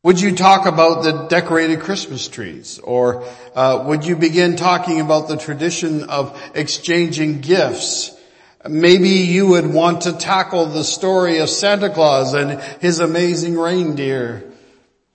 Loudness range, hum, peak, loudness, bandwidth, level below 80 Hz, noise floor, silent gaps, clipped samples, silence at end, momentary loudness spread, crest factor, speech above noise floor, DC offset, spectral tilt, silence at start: 4 LU; none; 0 dBFS; -16 LUFS; 8.8 kHz; -60 dBFS; -53 dBFS; none; under 0.1%; 0.65 s; 12 LU; 16 dB; 38 dB; under 0.1%; -4.5 dB/octave; 0.05 s